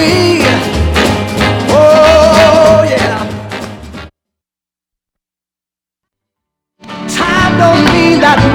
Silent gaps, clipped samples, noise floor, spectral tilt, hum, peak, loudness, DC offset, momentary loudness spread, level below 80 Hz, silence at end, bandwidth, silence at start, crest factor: none; 1%; -88 dBFS; -5 dB/octave; none; 0 dBFS; -8 LUFS; under 0.1%; 18 LU; -26 dBFS; 0 s; 17.5 kHz; 0 s; 10 dB